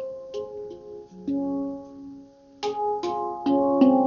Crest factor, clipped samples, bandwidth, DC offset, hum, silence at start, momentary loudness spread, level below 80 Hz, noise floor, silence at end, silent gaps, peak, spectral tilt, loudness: 20 dB; under 0.1%; 7 kHz; under 0.1%; none; 0 s; 21 LU; -64 dBFS; -47 dBFS; 0 s; none; -6 dBFS; -5.5 dB/octave; -26 LUFS